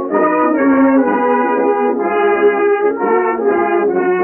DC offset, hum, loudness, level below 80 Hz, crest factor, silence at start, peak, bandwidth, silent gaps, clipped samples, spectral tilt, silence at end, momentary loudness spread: under 0.1%; none; -13 LUFS; -54 dBFS; 10 dB; 0 s; -2 dBFS; 3.2 kHz; none; under 0.1%; -5 dB/octave; 0 s; 3 LU